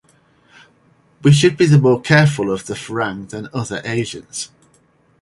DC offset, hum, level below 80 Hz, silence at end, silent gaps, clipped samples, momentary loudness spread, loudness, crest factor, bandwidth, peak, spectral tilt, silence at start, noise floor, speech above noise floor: under 0.1%; none; -52 dBFS; 0.75 s; none; under 0.1%; 15 LU; -16 LUFS; 18 dB; 11.5 kHz; 0 dBFS; -6 dB/octave; 1.25 s; -56 dBFS; 41 dB